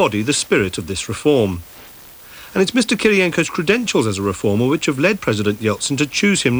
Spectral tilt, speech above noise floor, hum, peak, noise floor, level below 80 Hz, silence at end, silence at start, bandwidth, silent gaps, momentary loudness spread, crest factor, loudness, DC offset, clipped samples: -4.5 dB/octave; 23 dB; none; -2 dBFS; -40 dBFS; -48 dBFS; 0 s; 0 s; over 20 kHz; none; 14 LU; 16 dB; -17 LUFS; under 0.1%; under 0.1%